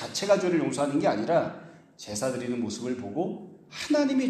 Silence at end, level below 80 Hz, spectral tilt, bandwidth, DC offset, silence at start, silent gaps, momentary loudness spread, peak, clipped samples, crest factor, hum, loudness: 0 s; -68 dBFS; -5 dB/octave; 13.5 kHz; under 0.1%; 0 s; none; 14 LU; -10 dBFS; under 0.1%; 18 dB; none; -28 LUFS